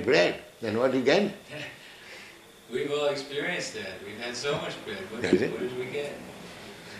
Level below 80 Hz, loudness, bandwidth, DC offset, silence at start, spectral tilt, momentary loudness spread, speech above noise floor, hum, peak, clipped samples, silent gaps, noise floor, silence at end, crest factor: -64 dBFS; -29 LUFS; 14.5 kHz; under 0.1%; 0 s; -4.5 dB/octave; 20 LU; 21 dB; none; -8 dBFS; under 0.1%; none; -49 dBFS; 0 s; 22 dB